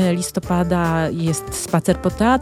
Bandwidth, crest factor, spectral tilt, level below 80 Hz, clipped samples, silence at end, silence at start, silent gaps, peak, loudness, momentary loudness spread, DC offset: 15.5 kHz; 16 dB; -5.5 dB/octave; -38 dBFS; under 0.1%; 0 s; 0 s; none; -2 dBFS; -20 LUFS; 4 LU; under 0.1%